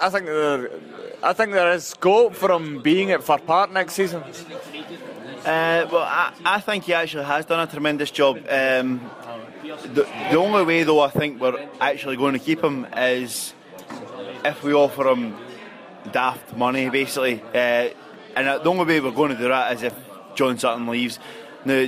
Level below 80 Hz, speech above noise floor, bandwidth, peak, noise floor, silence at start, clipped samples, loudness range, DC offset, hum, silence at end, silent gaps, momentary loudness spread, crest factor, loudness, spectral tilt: -66 dBFS; 20 dB; 15.5 kHz; -6 dBFS; -41 dBFS; 0 s; under 0.1%; 4 LU; under 0.1%; none; 0 s; none; 17 LU; 16 dB; -21 LUFS; -4.5 dB/octave